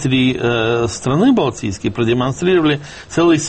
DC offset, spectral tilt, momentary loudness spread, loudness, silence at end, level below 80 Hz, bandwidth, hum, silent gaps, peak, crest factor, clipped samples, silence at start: under 0.1%; -5.5 dB/octave; 8 LU; -16 LUFS; 0 s; -42 dBFS; 8.8 kHz; none; none; -4 dBFS; 12 dB; under 0.1%; 0 s